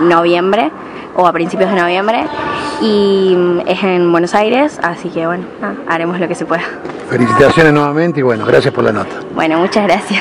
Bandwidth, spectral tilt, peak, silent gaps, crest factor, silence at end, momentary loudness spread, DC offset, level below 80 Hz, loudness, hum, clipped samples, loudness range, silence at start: 11 kHz; -6 dB/octave; 0 dBFS; none; 12 dB; 0 s; 9 LU; under 0.1%; -46 dBFS; -12 LUFS; none; 0.7%; 3 LU; 0 s